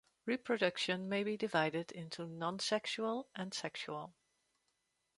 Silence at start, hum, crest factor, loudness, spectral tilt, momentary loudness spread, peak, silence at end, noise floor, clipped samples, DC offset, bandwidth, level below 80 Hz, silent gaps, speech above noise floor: 0.25 s; none; 20 dB; -38 LUFS; -4 dB/octave; 11 LU; -18 dBFS; 1.05 s; -83 dBFS; under 0.1%; under 0.1%; 11.5 kHz; -82 dBFS; none; 44 dB